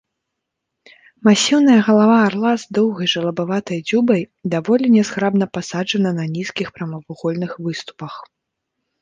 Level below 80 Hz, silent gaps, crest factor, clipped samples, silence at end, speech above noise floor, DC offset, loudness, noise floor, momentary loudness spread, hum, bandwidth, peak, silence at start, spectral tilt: -62 dBFS; none; 16 dB; under 0.1%; 0.8 s; 62 dB; under 0.1%; -17 LUFS; -79 dBFS; 14 LU; none; 9.6 kHz; -2 dBFS; 1.25 s; -5 dB/octave